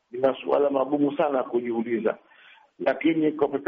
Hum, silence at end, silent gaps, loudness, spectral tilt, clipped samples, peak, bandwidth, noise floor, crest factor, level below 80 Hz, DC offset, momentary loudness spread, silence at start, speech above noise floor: none; 0 s; none; -25 LUFS; -5 dB/octave; under 0.1%; -10 dBFS; 5.2 kHz; -54 dBFS; 14 dB; -72 dBFS; under 0.1%; 5 LU; 0.15 s; 30 dB